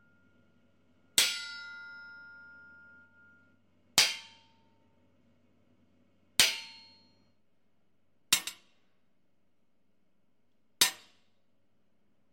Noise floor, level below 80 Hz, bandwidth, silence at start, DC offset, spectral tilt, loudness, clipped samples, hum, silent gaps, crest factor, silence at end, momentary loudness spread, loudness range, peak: -78 dBFS; -76 dBFS; 16 kHz; 1.15 s; under 0.1%; 1.5 dB/octave; -28 LUFS; under 0.1%; none; none; 34 dB; 1.35 s; 24 LU; 6 LU; -4 dBFS